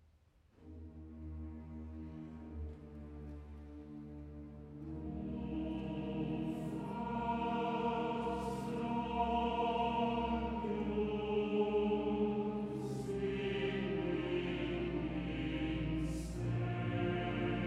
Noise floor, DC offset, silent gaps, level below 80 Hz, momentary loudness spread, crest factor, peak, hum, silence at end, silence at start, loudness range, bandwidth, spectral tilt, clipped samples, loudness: -68 dBFS; under 0.1%; none; -52 dBFS; 16 LU; 16 dB; -22 dBFS; none; 0 s; 0.6 s; 14 LU; 12.5 kHz; -7.5 dB/octave; under 0.1%; -38 LUFS